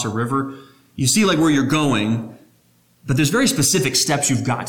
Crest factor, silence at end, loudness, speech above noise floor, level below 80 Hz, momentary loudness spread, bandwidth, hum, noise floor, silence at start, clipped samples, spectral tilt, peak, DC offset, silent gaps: 14 dB; 0 s; -18 LUFS; 39 dB; -50 dBFS; 12 LU; 19 kHz; 60 Hz at -45 dBFS; -57 dBFS; 0 s; under 0.1%; -4 dB/octave; -6 dBFS; under 0.1%; none